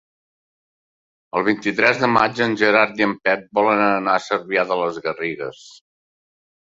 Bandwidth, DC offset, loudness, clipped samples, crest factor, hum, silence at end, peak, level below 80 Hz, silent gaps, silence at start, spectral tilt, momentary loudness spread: 7.8 kHz; under 0.1%; -19 LUFS; under 0.1%; 20 dB; none; 1.05 s; 0 dBFS; -62 dBFS; none; 1.35 s; -5 dB/octave; 10 LU